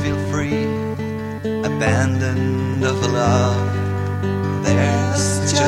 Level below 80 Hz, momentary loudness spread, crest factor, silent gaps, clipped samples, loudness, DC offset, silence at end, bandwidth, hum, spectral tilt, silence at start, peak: -44 dBFS; 7 LU; 16 dB; none; under 0.1%; -19 LUFS; under 0.1%; 0 s; 12.5 kHz; none; -5.5 dB/octave; 0 s; -4 dBFS